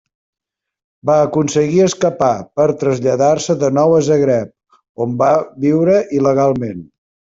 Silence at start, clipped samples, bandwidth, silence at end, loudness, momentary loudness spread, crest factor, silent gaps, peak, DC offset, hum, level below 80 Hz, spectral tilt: 1.05 s; under 0.1%; 8 kHz; 0.55 s; -15 LUFS; 9 LU; 12 dB; 4.89-4.95 s; -2 dBFS; under 0.1%; none; -54 dBFS; -6.5 dB/octave